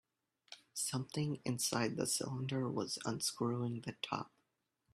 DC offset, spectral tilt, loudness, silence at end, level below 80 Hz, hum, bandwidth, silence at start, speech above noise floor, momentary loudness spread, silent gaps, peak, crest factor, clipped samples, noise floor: under 0.1%; -4 dB/octave; -39 LUFS; 0.65 s; -76 dBFS; none; 15.5 kHz; 0.5 s; 45 dB; 8 LU; none; -20 dBFS; 20 dB; under 0.1%; -84 dBFS